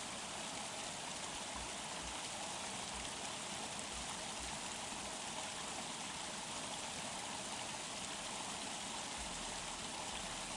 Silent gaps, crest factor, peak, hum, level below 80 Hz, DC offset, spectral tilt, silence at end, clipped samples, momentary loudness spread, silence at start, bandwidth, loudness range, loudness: none; 18 dB; -26 dBFS; none; -64 dBFS; under 0.1%; -1.5 dB/octave; 0 s; under 0.1%; 1 LU; 0 s; 12 kHz; 0 LU; -43 LUFS